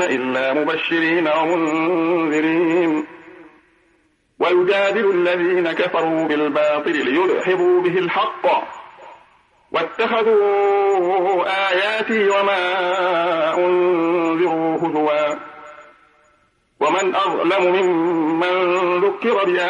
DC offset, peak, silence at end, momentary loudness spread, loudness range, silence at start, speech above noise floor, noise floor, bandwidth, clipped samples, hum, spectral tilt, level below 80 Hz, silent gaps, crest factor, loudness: under 0.1%; -6 dBFS; 0 s; 4 LU; 3 LU; 0 s; 43 dB; -60 dBFS; 7.4 kHz; under 0.1%; none; -5 dB/octave; -68 dBFS; none; 12 dB; -18 LUFS